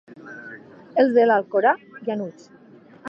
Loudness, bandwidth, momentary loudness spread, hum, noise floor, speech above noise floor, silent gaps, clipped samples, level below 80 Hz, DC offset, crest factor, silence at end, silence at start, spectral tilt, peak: -20 LUFS; 7.2 kHz; 23 LU; none; -47 dBFS; 27 dB; none; under 0.1%; -78 dBFS; under 0.1%; 18 dB; 0 s; 0.25 s; -7 dB/octave; -6 dBFS